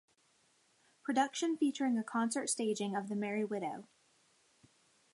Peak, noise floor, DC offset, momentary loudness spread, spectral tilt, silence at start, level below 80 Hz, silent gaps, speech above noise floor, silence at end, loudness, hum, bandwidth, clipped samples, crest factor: -18 dBFS; -72 dBFS; under 0.1%; 7 LU; -4 dB/octave; 1.05 s; -88 dBFS; none; 37 dB; 1.3 s; -36 LUFS; none; 11.5 kHz; under 0.1%; 20 dB